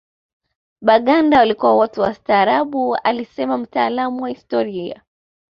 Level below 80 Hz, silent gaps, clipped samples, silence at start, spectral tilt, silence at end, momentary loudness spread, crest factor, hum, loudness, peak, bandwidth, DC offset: -56 dBFS; none; under 0.1%; 0.8 s; -7 dB/octave; 0.65 s; 10 LU; 18 dB; none; -17 LUFS; 0 dBFS; 6.8 kHz; under 0.1%